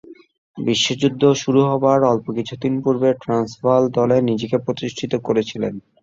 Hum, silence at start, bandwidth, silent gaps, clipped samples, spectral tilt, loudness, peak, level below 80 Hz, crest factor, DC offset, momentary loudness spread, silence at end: none; 0.1 s; 7.8 kHz; 0.38-0.54 s; under 0.1%; -5.5 dB/octave; -19 LUFS; -2 dBFS; -56 dBFS; 16 dB; under 0.1%; 9 LU; 0.25 s